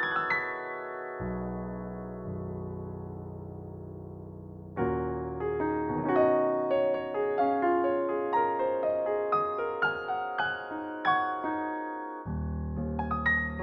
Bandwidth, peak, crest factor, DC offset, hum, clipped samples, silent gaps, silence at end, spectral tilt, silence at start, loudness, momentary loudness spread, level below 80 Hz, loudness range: 6.2 kHz; -14 dBFS; 18 dB; under 0.1%; none; under 0.1%; none; 0 s; -8.5 dB/octave; 0 s; -30 LUFS; 14 LU; -48 dBFS; 10 LU